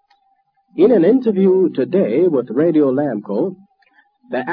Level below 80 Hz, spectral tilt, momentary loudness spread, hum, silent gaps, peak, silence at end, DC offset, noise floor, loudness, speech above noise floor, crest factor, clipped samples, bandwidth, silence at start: -66 dBFS; -11.5 dB/octave; 11 LU; none; none; -2 dBFS; 0 s; under 0.1%; -62 dBFS; -16 LUFS; 47 dB; 14 dB; under 0.1%; 4.9 kHz; 0.75 s